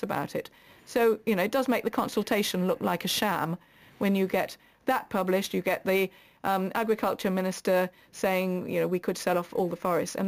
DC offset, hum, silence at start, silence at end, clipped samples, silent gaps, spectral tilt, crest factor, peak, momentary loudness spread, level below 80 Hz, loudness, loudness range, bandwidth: under 0.1%; none; 0 s; 0 s; under 0.1%; none; -5 dB/octave; 14 dB; -14 dBFS; 7 LU; -64 dBFS; -28 LUFS; 1 LU; 15.5 kHz